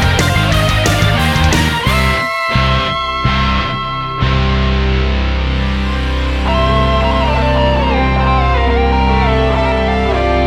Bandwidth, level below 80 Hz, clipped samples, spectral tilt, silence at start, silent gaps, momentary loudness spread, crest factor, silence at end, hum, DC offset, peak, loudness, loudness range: 15.5 kHz; -18 dBFS; under 0.1%; -5.5 dB/octave; 0 s; none; 4 LU; 12 dB; 0 s; none; under 0.1%; 0 dBFS; -13 LUFS; 2 LU